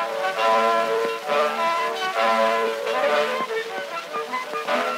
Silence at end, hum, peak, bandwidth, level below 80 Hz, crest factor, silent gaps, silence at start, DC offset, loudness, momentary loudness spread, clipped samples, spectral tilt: 0 s; none; -8 dBFS; 16 kHz; -90 dBFS; 14 dB; none; 0 s; under 0.1%; -22 LUFS; 9 LU; under 0.1%; -2 dB/octave